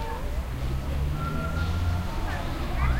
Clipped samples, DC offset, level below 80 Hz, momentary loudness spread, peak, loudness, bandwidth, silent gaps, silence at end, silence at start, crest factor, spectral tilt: under 0.1%; under 0.1%; -30 dBFS; 4 LU; -14 dBFS; -30 LUFS; 16 kHz; none; 0 s; 0 s; 14 dB; -6.5 dB/octave